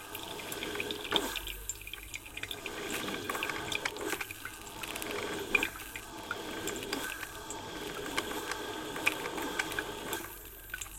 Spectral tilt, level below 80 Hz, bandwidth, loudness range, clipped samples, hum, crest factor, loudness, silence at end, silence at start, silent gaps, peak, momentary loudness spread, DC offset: -2 dB/octave; -56 dBFS; 17 kHz; 2 LU; under 0.1%; none; 28 dB; -36 LUFS; 0 s; 0 s; none; -10 dBFS; 10 LU; under 0.1%